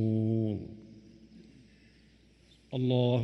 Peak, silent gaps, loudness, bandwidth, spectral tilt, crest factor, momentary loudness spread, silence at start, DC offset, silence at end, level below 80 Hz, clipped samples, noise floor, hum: -14 dBFS; none; -31 LUFS; 6 kHz; -9.5 dB/octave; 18 dB; 25 LU; 0 s; under 0.1%; 0 s; -64 dBFS; under 0.1%; -61 dBFS; none